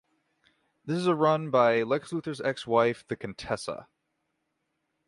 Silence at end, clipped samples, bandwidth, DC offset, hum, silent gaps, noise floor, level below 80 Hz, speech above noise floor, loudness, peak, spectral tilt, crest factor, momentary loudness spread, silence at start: 1.25 s; under 0.1%; 11.5 kHz; under 0.1%; none; none; -79 dBFS; -66 dBFS; 52 dB; -27 LUFS; -10 dBFS; -6 dB/octave; 20 dB; 13 LU; 0.85 s